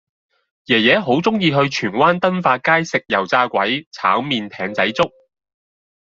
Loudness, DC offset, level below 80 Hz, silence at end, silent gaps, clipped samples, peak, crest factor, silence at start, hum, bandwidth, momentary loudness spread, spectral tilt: -17 LUFS; under 0.1%; -58 dBFS; 1.1 s; 3.87-3.92 s; under 0.1%; -2 dBFS; 18 dB; 0.7 s; none; 7.8 kHz; 6 LU; -5 dB/octave